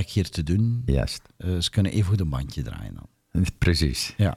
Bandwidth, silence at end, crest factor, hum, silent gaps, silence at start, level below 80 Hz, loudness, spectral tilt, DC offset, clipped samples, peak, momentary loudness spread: 15 kHz; 0 s; 18 dB; none; none; 0 s; -34 dBFS; -25 LUFS; -5.5 dB/octave; under 0.1%; under 0.1%; -8 dBFS; 11 LU